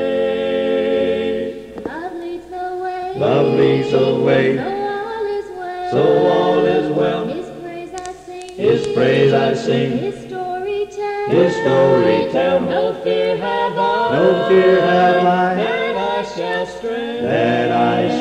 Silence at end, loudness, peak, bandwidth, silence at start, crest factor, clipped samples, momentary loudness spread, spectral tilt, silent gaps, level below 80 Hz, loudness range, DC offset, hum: 0 s; -17 LUFS; -2 dBFS; 10 kHz; 0 s; 14 dB; under 0.1%; 14 LU; -6.5 dB/octave; none; -52 dBFS; 3 LU; under 0.1%; none